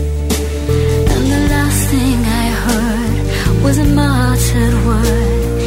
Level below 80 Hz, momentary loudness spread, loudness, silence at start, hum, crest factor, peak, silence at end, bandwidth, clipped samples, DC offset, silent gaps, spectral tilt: -18 dBFS; 4 LU; -14 LUFS; 0 s; none; 12 dB; -2 dBFS; 0 s; 16.5 kHz; under 0.1%; under 0.1%; none; -5.5 dB/octave